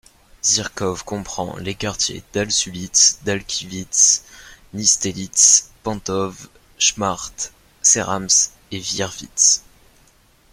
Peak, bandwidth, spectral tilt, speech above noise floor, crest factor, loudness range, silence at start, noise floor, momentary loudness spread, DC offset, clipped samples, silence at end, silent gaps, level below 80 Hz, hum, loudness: 0 dBFS; 16.5 kHz; -1 dB/octave; 35 dB; 20 dB; 3 LU; 0.45 s; -54 dBFS; 15 LU; under 0.1%; under 0.1%; 0.9 s; none; -50 dBFS; none; -17 LUFS